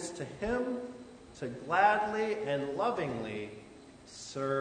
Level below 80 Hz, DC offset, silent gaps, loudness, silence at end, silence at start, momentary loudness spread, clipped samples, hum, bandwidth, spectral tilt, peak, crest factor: -60 dBFS; under 0.1%; none; -33 LUFS; 0 s; 0 s; 23 LU; under 0.1%; none; 9.6 kHz; -5 dB/octave; -12 dBFS; 22 dB